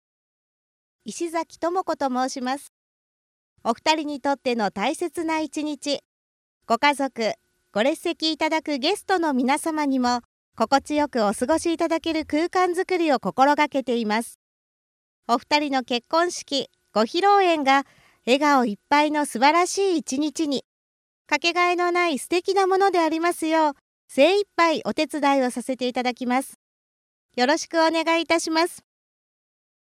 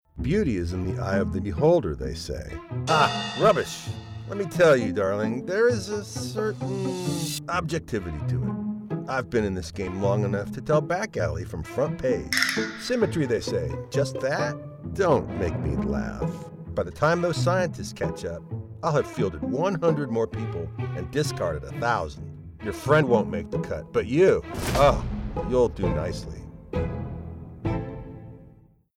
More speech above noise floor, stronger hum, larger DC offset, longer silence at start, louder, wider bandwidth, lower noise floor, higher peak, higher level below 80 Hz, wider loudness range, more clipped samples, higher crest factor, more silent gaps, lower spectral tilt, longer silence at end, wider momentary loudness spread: first, over 68 dB vs 28 dB; neither; neither; first, 1.05 s vs 0.15 s; first, -22 LUFS vs -26 LUFS; about the same, 15.5 kHz vs 16 kHz; first, under -90 dBFS vs -53 dBFS; about the same, -4 dBFS vs -4 dBFS; second, -64 dBFS vs -42 dBFS; about the same, 5 LU vs 5 LU; neither; about the same, 18 dB vs 22 dB; first, 2.69-3.56 s, 6.05-6.61 s, 10.25-10.52 s, 14.35-15.23 s, 20.64-21.25 s, 23.81-24.08 s, 26.55-27.29 s vs none; second, -3 dB/octave vs -6 dB/octave; first, 1.05 s vs 0.45 s; second, 9 LU vs 13 LU